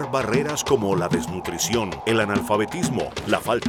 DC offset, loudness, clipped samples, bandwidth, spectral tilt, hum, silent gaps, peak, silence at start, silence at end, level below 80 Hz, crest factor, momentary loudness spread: under 0.1%; -23 LUFS; under 0.1%; 18 kHz; -4.5 dB/octave; none; none; -4 dBFS; 0 s; 0 s; -48 dBFS; 18 dB; 4 LU